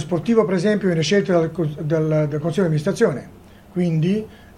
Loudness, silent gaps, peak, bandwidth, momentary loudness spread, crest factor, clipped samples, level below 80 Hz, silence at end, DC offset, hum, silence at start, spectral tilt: -20 LUFS; none; -4 dBFS; 12 kHz; 7 LU; 16 dB; under 0.1%; -52 dBFS; 0.2 s; under 0.1%; none; 0 s; -7 dB/octave